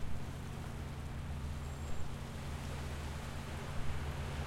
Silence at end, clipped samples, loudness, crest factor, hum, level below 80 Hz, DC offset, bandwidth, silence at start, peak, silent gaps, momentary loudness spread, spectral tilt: 0 s; under 0.1%; -44 LUFS; 14 dB; none; -46 dBFS; under 0.1%; 16.5 kHz; 0 s; -24 dBFS; none; 3 LU; -5.5 dB/octave